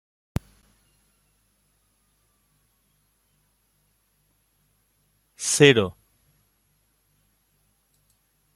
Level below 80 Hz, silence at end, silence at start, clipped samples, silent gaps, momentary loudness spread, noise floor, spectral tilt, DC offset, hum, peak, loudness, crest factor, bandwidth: -56 dBFS; 2.65 s; 5.4 s; under 0.1%; none; 19 LU; -68 dBFS; -3.5 dB/octave; under 0.1%; none; -2 dBFS; -21 LUFS; 28 dB; 14.5 kHz